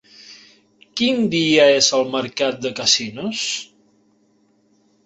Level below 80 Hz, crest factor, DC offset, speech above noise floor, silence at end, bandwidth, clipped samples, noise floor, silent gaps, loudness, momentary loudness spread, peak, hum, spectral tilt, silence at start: -64 dBFS; 20 dB; under 0.1%; 42 dB; 1.4 s; 8.4 kHz; under 0.1%; -60 dBFS; none; -18 LUFS; 11 LU; -2 dBFS; none; -2.5 dB/octave; 0.3 s